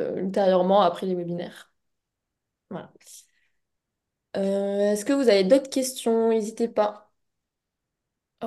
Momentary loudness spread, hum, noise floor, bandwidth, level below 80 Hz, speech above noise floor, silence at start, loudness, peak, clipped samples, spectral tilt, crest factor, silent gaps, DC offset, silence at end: 17 LU; none; -84 dBFS; 12.5 kHz; -76 dBFS; 61 dB; 0 s; -23 LUFS; -6 dBFS; under 0.1%; -5 dB/octave; 20 dB; none; under 0.1%; 0 s